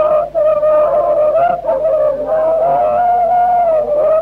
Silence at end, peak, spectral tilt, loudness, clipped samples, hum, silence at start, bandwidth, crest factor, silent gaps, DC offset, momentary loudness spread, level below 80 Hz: 0 s; -4 dBFS; -7 dB/octave; -13 LUFS; under 0.1%; none; 0 s; 4.3 kHz; 8 dB; none; under 0.1%; 3 LU; -44 dBFS